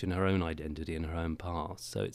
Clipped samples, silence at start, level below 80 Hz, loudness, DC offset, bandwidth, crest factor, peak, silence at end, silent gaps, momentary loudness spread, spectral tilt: under 0.1%; 0 s; -50 dBFS; -35 LUFS; under 0.1%; 15 kHz; 18 dB; -18 dBFS; 0 s; none; 8 LU; -6.5 dB/octave